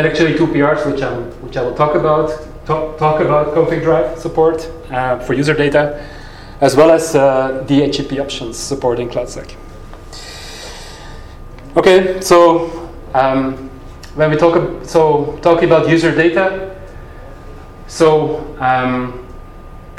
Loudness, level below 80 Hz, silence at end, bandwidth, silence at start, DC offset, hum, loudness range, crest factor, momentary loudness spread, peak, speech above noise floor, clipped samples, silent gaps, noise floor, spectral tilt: -14 LUFS; -34 dBFS; 0 s; 15 kHz; 0 s; under 0.1%; none; 5 LU; 14 dB; 20 LU; 0 dBFS; 20 dB; under 0.1%; none; -33 dBFS; -5.5 dB/octave